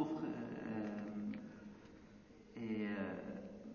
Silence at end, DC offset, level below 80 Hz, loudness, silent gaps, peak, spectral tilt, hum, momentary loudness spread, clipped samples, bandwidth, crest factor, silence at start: 0 s; under 0.1%; -72 dBFS; -45 LUFS; none; -26 dBFS; -6.5 dB/octave; none; 18 LU; under 0.1%; 6.8 kHz; 18 dB; 0 s